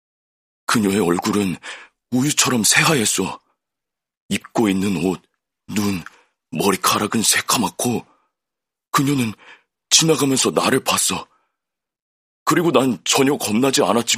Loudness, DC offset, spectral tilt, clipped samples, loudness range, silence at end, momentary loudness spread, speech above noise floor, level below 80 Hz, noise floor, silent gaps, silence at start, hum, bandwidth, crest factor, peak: -18 LUFS; under 0.1%; -3 dB/octave; under 0.1%; 4 LU; 0 s; 13 LU; 67 dB; -60 dBFS; -85 dBFS; 4.17-4.29 s, 12.02-12.46 s; 0.7 s; none; 15.5 kHz; 20 dB; 0 dBFS